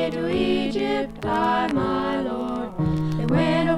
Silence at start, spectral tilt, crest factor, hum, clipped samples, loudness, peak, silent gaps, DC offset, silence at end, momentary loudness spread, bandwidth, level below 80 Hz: 0 s; -7.5 dB/octave; 14 dB; none; under 0.1%; -23 LUFS; -8 dBFS; none; under 0.1%; 0 s; 5 LU; 12 kHz; -44 dBFS